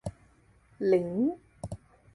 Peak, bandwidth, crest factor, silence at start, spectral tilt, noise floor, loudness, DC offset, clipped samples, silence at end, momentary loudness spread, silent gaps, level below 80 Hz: -14 dBFS; 11.5 kHz; 18 dB; 0.05 s; -8 dB/octave; -62 dBFS; -29 LUFS; under 0.1%; under 0.1%; 0.4 s; 17 LU; none; -56 dBFS